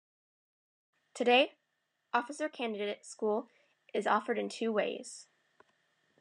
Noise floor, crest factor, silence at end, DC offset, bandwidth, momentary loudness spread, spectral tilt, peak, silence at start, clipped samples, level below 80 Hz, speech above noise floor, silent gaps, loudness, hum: -82 dBFS; 22 dB; 1 s; under 0.1%; 10.5 kHz; 13 LU; -3.5 dB/octave; -14 dBFS; 1.15 s; under 0.1%; under -90 dBFS; 49 dB; none; -33 LUFS; none